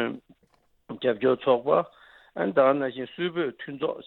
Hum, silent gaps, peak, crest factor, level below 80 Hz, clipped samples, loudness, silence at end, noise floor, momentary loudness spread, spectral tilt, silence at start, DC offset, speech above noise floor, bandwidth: none; none; -8 dBFS; 18 dB; -72 dBFS; under 0.1%; -26 LUFS; 0.05 s; -66 dBFS; 16 LU; -9 dB/octave; 0 s; under 0.1%; 41 dB; 4.2 kHz